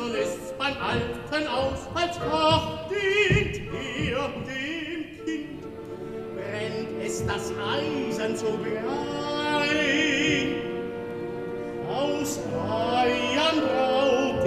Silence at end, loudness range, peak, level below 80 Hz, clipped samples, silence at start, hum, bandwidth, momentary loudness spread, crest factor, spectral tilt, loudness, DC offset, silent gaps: 0 s; 6 LU; -10 dBFS; -48 dBFS; under 0.1%; 0 s; none; 15 kHz; 11 LU; 18 dB; -4.5 dB/octave; -26 LUFS; under 0.1%; none